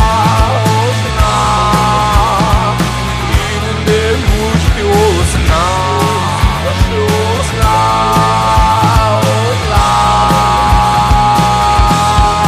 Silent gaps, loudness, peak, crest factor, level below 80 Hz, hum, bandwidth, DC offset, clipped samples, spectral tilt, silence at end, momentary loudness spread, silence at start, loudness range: none; -11 LUFS; 0 dBFS; 10 dB; -18 dBFS; none; 15.5 kHz; under 0.1%; under 0.1%; -5 dB/octave; 0 s; 4 LU; 0 s; 2 LU